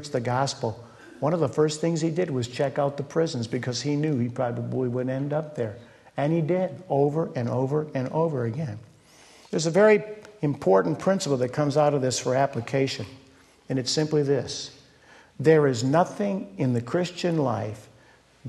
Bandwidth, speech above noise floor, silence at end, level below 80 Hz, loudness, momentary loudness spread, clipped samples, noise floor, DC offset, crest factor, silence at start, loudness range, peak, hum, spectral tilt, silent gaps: 12 kHz; 32 dB; 0 s; -64 dBFS; -25 LUFS; 11 LU; under 0.1%; -56 dBFS; under 0.1%; 18 dB; 0 s; 4 LU; -6 dBFS; none; -6 dB/octave; none